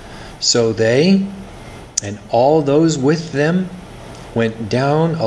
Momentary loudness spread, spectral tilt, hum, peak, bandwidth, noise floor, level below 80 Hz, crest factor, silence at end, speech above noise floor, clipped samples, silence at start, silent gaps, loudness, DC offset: 21 LU; -5 dB/octave; none; 0 dBFS; 11 kHz; -35 dBFS; -44 dBFS; 16 dB; 0 s; 20 dB; under 0.1%; 0 s; none; -16 LUFS; under 0.1%